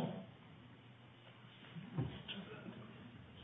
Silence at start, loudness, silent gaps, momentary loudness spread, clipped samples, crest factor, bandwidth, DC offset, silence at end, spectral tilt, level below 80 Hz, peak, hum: 0 s; -51 LUFS; none; 15 LU; under 0.1%; 20 dB; 4 kHz; under 0.1%; 0 s; -5.5 dB/octave; -70 dBFS; -30 dBFS; none